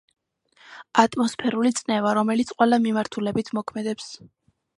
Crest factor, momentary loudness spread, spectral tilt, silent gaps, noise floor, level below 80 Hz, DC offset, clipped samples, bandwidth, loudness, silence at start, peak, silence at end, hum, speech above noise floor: 22 dB; 10 LU; -4.5 dB/octave; none; -57 dBFS; -64 dBFS; under 0.1%; under 0.1%; 11.5 kHz; -23 LUFS; 0.7 s; -2 dBFS; 0.6 s; none; 35 dB